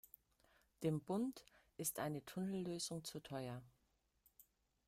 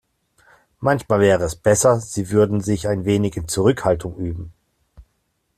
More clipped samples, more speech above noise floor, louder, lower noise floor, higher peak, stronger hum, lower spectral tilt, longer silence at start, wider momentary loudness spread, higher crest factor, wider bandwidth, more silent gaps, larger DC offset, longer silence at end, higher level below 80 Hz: neither; second, 37 dB vs 51 dB; second, -45 LUFS vs -19 LUFS; first, -82 dBFS vs -70 dBFS; second, -28 dBFS vs -2 dBFS; neither; about the same, -5 dB/octave vs -5.5 dB/octave; about the same, 0.8 s vs 0.8 s; first, 17 LU vs 12 LU; about the same, 20 dB vs 18 dB; first, 16 kHz vs 14.5 kHz; neither; neither; about the same, 0.45 s vs 0.55 s; second, -78 dBFS vs -44 dBFS